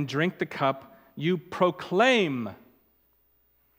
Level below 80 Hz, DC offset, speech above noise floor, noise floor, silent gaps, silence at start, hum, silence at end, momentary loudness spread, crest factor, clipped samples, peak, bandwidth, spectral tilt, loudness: -72 dBFS; under 0.1%; 41 dB; -67 dBFS; none; 0 s; none; 1.25 s; 15 LU; 20 dB; under 0.1%; -8 dBFS; 16.5 kHz; -5.5 dB/octave; -26 LUFS